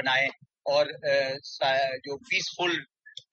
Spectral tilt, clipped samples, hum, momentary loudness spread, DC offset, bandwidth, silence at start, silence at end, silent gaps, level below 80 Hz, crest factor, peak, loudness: -2.5 dB/octave; under 0.1%; none; 11 LU; under 0.1%; 7.8 kHz; 0 s; 0.2 s; none; -78 dBFS; 18 dB; -12 dBFS; -27 LUFS